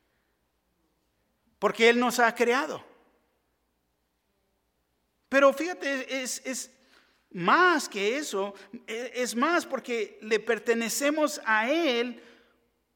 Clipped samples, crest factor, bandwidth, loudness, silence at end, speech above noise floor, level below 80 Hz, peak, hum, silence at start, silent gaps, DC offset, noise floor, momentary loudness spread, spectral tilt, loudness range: under 0.1%; 22 dB; 17.5 kHz; -26 LUFS; 0.75 s; 49 dB; -78 dBFS; -8 dBFS; none; 1.6 s; none; under 0.1%; -76 dBFS; 14 LU; -2.5 dB/octave; 4 LU